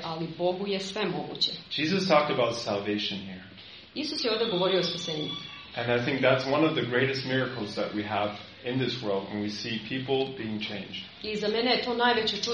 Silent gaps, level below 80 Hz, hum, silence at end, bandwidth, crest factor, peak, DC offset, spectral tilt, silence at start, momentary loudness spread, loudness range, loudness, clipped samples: none; -64 dBFS; none; 0 s; 9.6 kHz; 20 dB; -8 dBFS; under 0.1%; -5 dB/octave; 0 s; 11 LU; 4 LU; -28 LUFS; under 0.1%